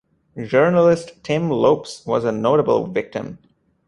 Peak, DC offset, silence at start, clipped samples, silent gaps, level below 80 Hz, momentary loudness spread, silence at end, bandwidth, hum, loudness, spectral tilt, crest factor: -2 dBFS; under 0.1%; 0.35 s; under 0.1%; none; -56 dBFS; 14 LU; 0.5 s; 11 kHz; none; -19 LUFS; -7 dB/octave; 18 dB